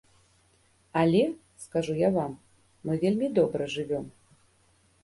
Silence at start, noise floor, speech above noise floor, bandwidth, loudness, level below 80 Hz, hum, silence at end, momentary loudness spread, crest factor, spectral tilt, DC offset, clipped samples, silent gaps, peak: 0.95 s; -65 dBFS; 39 dB; 11.5 kHz; -28 LUFS; -62 dBFS; none; 0.95 s; 15 LU; 18 dB; -7 dB/octave; under 0.1%; under 0.1%; none; -12 dBFS